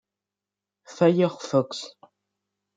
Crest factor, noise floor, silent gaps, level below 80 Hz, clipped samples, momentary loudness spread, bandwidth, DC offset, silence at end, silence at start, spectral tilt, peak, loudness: 20 dB; -89 dBFS; none; -76 dBFS; under 0.1%; 15 LU; 9.2 kHz; under 0.1%; 0.9 s; 0.9 s; -6.5 dB/octave; -8 dBFS; -23 LUFS